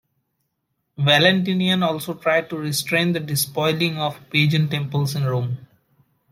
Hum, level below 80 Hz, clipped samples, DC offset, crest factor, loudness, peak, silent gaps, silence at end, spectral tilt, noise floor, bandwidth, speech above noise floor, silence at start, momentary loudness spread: none; -62 dBFS; under 0.1%; under 0.1%; 20 dB; -20 LUFS; -2 dBFS; none; 0.65 s; -4.5 dB/octave; -75 dBFS; 16.5 kHz; 54 dB; 1 s; 9 LU